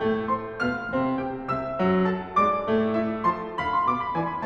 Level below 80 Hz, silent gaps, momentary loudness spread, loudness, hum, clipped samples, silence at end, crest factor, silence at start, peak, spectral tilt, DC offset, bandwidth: -52 dBFS; none; 6 LU; -25 LUFS; none; under 0.1%; 0 s; 14 dB; 0 s; -12 dBFS; -8 dB/octave; under 0.1%; 7.6 kHz